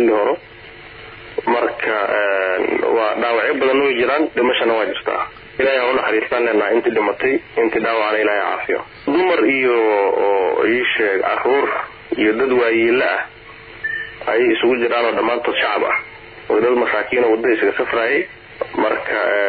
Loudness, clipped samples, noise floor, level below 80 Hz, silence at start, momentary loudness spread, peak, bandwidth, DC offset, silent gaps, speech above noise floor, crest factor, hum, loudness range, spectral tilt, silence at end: -17 LUFS; under 0.1%; -38 dBFS; -54 dBFS; 0 s; 9 LU; -6 dBFS; 4.9 kHz; under 0.1%; none; 22 dB; 12 dB; none; 2 LU; -8 dB/octave; 0 s